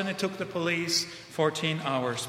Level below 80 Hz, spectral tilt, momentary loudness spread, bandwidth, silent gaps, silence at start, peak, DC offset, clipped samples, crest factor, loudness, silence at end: -70 dBFS; -3.5 dB/octave; 5 LU; 16 kHz; none; 0 s; -12 dBFS; under 0.1%; under 0.1%; 18 dB; -29 LUFS; 0 s